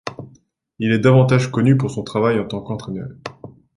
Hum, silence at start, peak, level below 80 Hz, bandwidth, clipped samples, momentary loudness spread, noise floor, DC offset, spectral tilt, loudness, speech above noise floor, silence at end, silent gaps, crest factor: none; 0.05 s; -2 dBFS; -52 dBFS; 11 kHz; under 0.1%; 19 LU; -54 dBFS; under 0.1%; -7.5 dB/octave; -18 LUFS; 37 dB; 0.3 s; none; 18 dB